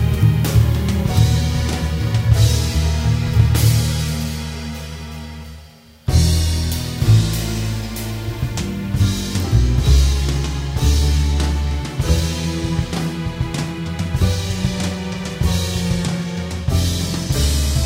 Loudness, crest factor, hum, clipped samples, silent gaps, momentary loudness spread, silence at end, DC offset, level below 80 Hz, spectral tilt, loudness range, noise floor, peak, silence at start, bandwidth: -19 LUFS; 16 dB; none; under 0.1%; none; 10 LU; 0 s; under 0.1%; -22 dBFS; -5.5 dB/octave; 4 LU; -42 dBFS; 0 dBFS; 0 s; 16.5 kHz